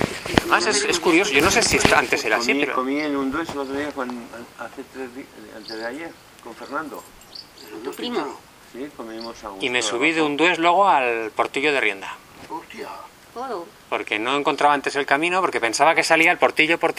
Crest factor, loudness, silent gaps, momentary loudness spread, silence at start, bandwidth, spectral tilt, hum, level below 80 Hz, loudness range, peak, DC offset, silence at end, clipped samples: 22 dB; -20 LUFS; none; 20 LU; 0 s; 16 kHz; -3 dB/octave; none; -50 dBFS; 14 LU; 0 dBFS; under 0.1%; 0 s; under 0.1%